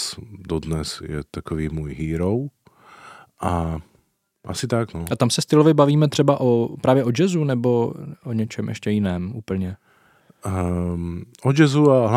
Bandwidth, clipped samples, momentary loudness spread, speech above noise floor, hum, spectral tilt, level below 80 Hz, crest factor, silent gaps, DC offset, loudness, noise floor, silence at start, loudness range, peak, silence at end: 15.5 kHz; under 0.1%; 15 LU; 43 dB; none; -6.5 dB/octave; -44 dBFS; 20 dB; none; under 0.1%; -21 LUFS; -64 dBFS; 0 s; 9 LU; -2 dBFS; 0 s